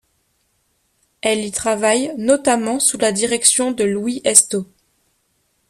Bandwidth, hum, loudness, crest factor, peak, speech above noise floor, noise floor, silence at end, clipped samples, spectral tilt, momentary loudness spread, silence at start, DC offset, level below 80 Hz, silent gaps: 15.5 kHz; none; -16 LUFS; 20 dB; 0 dBFS; 48 dB; -65 dBFS; 1.05 s; under 0.1%; -2 dB/octave; 9 LU; 1.25 s; under 0.1%; -58 dBFS; none